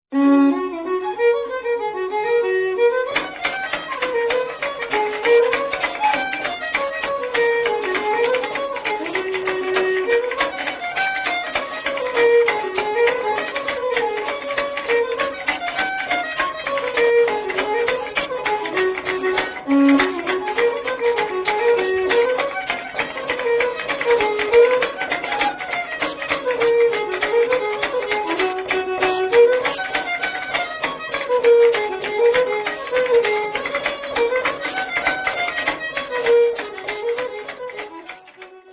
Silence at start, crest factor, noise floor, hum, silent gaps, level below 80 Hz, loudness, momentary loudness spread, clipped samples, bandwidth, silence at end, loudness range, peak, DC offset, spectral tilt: 0.1 s; 18 dB; -42 dBFS; none; none; -54 dBFS; -20 LUFS; 8 LU; under 0.1%; 4 kHz; 0 s; 3 LU; -2 dBFS; under 0.1%; -7 dB/octave